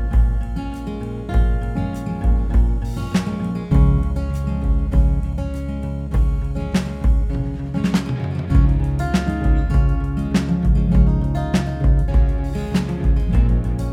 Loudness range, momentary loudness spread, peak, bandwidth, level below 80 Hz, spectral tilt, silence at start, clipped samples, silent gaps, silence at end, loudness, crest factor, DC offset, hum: 3 LU; 8 LU; -2 dBFS; 9.6 kHz; -20 dBFS; -8 dB/octave; 0 s; under 0.1%; none; 0 s; -20 LUFS; 16 dB; under 0.1%; none